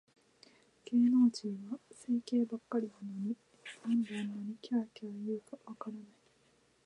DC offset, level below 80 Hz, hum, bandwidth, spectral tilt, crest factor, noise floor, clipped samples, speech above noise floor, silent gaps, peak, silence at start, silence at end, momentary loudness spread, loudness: under 0.1%; -86 dBFS; none; 10.5 kHz; -6.5 dB/octave; 16 dB; -70 dBFS; under 0.1%; 36 dB; none; -20 dBFS; 0.85 s; 0.8 s; 17 LU; -36 LUFS